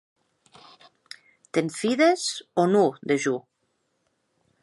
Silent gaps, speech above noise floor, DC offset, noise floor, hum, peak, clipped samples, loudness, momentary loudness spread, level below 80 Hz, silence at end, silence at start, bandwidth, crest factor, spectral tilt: none; 51 dB; under 0.1%; -74 dBFS; none; -8 dBFS; under 0.1%; -24 LUFS; 24 LU; -76 dBFS; 1.25 s; 1.55 s; 11.5 kHz; 20 dB; -4.5 dB/octave